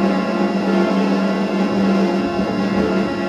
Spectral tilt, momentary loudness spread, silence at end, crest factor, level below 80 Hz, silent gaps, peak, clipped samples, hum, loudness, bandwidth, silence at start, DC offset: -7 dB/octave; 3 LU; 0 s; 12 dB; -48 dBFS; none; -4 dBFS; under 0.1%; none; -18 LUFS; 9.2 kHz; 0 s; under 0.1%